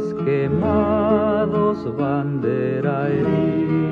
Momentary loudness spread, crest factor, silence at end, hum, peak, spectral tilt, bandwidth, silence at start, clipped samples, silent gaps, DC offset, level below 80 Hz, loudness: 4 LU; 14 dB; 0 s; none; -6 dBFS; -10 dB/octave; 6.2 kHz; 0 s; under 0.1%; none; under 0.1%; -42 dBFS; -20 LUFS